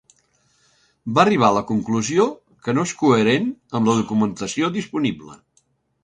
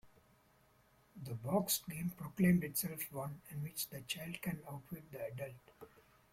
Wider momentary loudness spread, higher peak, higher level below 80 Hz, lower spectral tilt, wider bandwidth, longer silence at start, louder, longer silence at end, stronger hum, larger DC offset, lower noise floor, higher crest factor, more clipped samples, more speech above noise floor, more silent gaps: second, 9 LU vs 17 LU; first, 0 dBFS vs -20 dBFS; first, -58 dBFS vs -70 dBFS; about the same, -5.5 dB/octave vs -5 dB/octave; second, 9.6 kHz vs 16.5 kHz; first, 1.05 s vs 0.05 s; first, -20 LUFS vs -40 LUFS; first, 0.7 s vs 0.45 s; neither; neither; second, -64 dBFS vs -70 dBFS; about the same, 20 dB vs 20 dB; neither; first, 45 dB vs 30 dB; neither